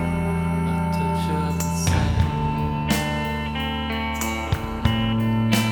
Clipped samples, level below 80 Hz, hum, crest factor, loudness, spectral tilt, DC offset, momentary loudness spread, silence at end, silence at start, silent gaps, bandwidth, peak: under 0.1%; -32 dBFS; none; 18 dB; -23 LUFS; -5.5 dB/octave; under 0.1%; 5 LU; 0 s; 0 s; none; 19 kHz; -4 dBFS